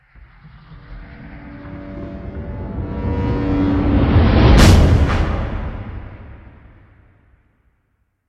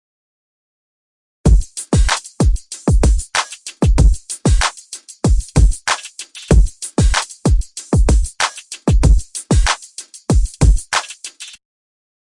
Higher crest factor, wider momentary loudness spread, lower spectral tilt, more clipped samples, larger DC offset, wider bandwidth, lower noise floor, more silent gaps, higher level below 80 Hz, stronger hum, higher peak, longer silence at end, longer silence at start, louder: about the same, 18 dB vs 14 dB; first, 26 LU vs 14 LU; first, -6.5 dB/octave vs -4.5 dB/octave; neither; neither; first, 14 kHz vs 11.5 kHz; first, -66 dBFS vs -36 dBFS; neither; about the same, -22 dBFS vs -18 dBFS; neither; about the same, 0 dBFS vs -2 dBFS; first, 1.9 s vs 0.75 s; second, 0.45 s vs 1.45 s; about the same, -16 LUFS vs -17 LUFS